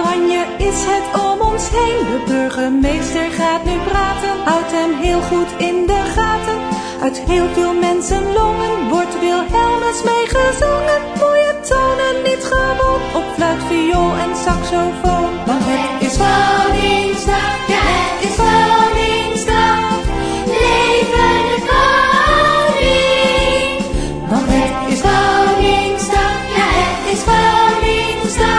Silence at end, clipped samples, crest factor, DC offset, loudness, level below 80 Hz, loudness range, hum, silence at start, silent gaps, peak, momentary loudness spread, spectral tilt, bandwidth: 0 s; under 0.1%; 14 dB; under 0.1%; -14 LUFS; -26 dBFS; 4 LU; none; 0 s; none; 0 dBFS; 6 LU; -4 dB/octave; 11 kHz